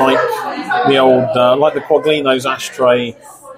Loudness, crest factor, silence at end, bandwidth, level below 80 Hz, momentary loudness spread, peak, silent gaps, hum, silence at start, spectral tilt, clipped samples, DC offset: -13 LUFS; 14 dB; 0 s; 16 kHz; -54 dBFS; 8 LU; 0 dBFS; none; none; 0 s; -4.5 dB/octave; under 0.1%; under 0.1%